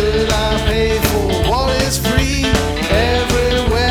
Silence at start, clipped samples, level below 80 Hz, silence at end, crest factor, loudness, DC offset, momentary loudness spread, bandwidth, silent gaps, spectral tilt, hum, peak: 0 s; under 0.1%; -22 dBFS; 0 s; 14 dB; -15 LUFS; under 0.1%; 1 LU; 19.5 kHz; none; -4.5 dB/octave; none; 0 dBFS